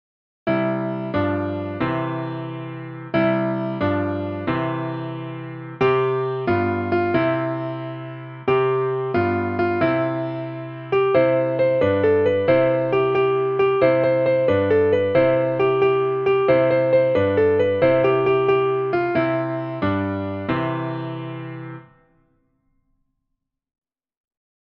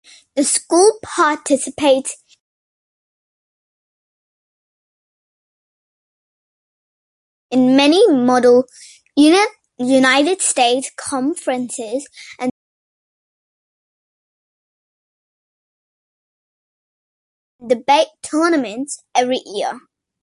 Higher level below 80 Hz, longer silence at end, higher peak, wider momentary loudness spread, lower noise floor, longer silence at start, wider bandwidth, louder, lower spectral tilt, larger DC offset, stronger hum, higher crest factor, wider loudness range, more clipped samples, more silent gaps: first, -56 dBFS vs -64 dBFS; first, 2.9 s vs 0.45 s; second, -6 dBFS vs -2 dBFS; about the same, 13 LU vs 14 LU; second, -78 dBFS vs under -90 dBFS; about the same, 0.45 s vs 0.35 s; second, 5.6 kHz vs 11.5 kHz; second, -20 LUFS vs -16 LUFS; first, -9.5 dB/octave vs -2 dB/octave; neither; neither; about the same, 16 dB vs 18 dB; second, 8 LU vs 15 LU; neither; second, none vs 2.40-7.49 s, 12.51-17.59 s